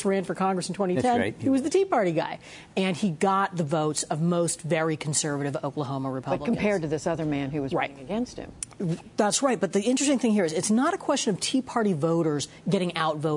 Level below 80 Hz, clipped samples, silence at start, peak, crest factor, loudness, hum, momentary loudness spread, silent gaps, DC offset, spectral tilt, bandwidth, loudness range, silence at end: -60 dBFS; under 0.1%; 0 s; -10 dBFS; 16 dB; -26 LUFS; none; 7 LU; none; under 0.1%; -5 dB/octave; 11 kHz; 4 LU; 0 s